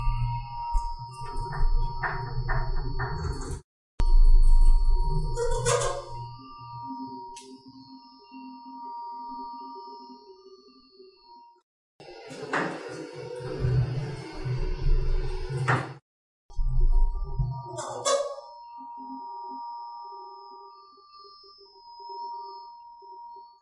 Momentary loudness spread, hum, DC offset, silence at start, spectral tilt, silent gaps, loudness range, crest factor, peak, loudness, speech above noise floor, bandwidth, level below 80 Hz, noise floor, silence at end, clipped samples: 22 LU; none; under 0.1%; 0 s; -5 dB/octave; 3.64-3.98 s, 11.63-11.99 s, 16.02-16.49 s; 14 LU; 18 dB; -8 dBFS; -31 LUFS; 25 dB; 11 kHz; -28 dBFS; -54 dBFS; 0.15 s; under 0.1%